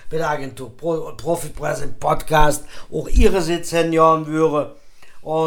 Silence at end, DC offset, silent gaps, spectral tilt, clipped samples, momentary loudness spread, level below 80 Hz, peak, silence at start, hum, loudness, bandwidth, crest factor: 0 s; under 0.1%; none; -5.5 dB/octave; under 0.1%; 13 LU; -26 dBFS; 0 dBFS; 0 s; none; -20 LUFS; 18 kHz; 18 dB